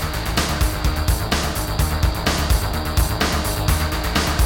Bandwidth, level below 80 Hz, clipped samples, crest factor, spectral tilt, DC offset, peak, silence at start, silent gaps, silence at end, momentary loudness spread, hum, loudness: 18 kHz; -24 dBFS; under 0.1%; 16 dB; -4 dB/octave; under 0.1%; -4 dBFS; 0 s; none; 0 s; 2 LU; none; -21 LUFS